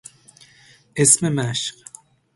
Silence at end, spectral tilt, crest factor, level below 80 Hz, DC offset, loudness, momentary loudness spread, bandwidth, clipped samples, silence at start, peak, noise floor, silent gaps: 0.65 s; -3 dB/octave; 24 dB; -58 dBFS; under 0.1%; -18 LUFS; 15 LU; 11.5 kHz; under 0.1%; 0.95 s; 0 dBFS; -52 dBFS; none